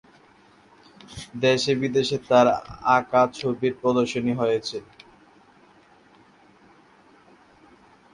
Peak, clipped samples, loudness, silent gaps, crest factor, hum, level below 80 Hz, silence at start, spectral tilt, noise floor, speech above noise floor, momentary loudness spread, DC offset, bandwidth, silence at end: -4 dBFS; under 0.1%; -22 LUFS; none; 20 dB; none; -60 dBFS; 1.1 s; -5 dB/octave; -55 dBFS; 33 dB; 15 LU; under 0.1%; 11 kHz; 3.35 s